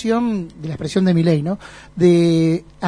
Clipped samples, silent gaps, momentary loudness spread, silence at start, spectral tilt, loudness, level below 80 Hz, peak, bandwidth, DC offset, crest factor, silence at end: under 0.1%; none; 14 LU; 0 s; -7.5 dB/octave; -17 LUFS; -48 dBFS; -2 dBFS; 10.5 kHz; under 0.1%; 14 dB; 0 s